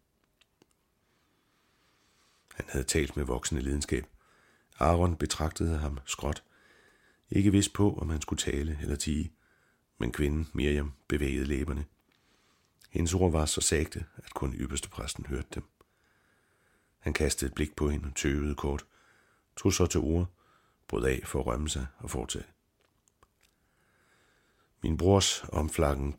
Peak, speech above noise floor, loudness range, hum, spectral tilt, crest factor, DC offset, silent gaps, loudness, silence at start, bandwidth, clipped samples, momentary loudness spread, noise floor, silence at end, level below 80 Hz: -8 dBFS; 43 dB; 5 LU; none; -5 dB/octave; 24 dB; under 0.1%; none; -31 LUFS; 2.55 s; 16.5 kHz; under 0.1%; 12 LU; -73 dBFS; 0 s; -40 dBFS